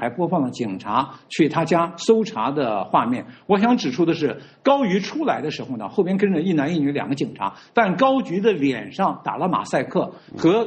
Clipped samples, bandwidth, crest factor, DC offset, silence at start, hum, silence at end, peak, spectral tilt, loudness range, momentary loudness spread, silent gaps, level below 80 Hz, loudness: under 0.1%; 9 kHz; 18 dB; under 0.1%; 0 s; none; 0 s; -2 dBFS; -6.5 dB/octave; 1 LU; 7 LU; none; -64 dBFS; -21 LUFS